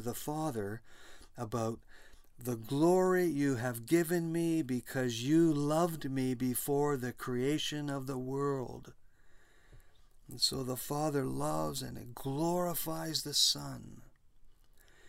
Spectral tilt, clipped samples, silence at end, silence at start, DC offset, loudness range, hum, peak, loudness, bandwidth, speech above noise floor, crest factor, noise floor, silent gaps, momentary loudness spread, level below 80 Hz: -4.5 dB/octave; under 0.1%; 0 s; 0 s; under 0.1%; 6 LU; none; -16 dBFS; -33 LUFS; 16 kHz; 26 dB; 18 dB; -60 dBFS; none; 15 LU; -60 dBFS